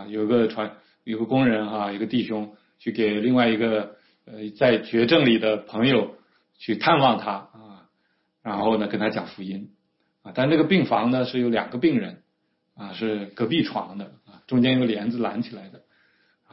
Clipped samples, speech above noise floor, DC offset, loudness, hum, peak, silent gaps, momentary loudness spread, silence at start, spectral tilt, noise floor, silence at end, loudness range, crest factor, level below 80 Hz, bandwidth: under 0.1%; 50 dB; under 0.1%; -23 LUFS; none; -6 dBFS; none; 17 LU; 0 s; -10.5 dB/octave; -72 dBFS; 0.75 s; 5 LU; 18 dB; -64 dBFS; 5.8 kHz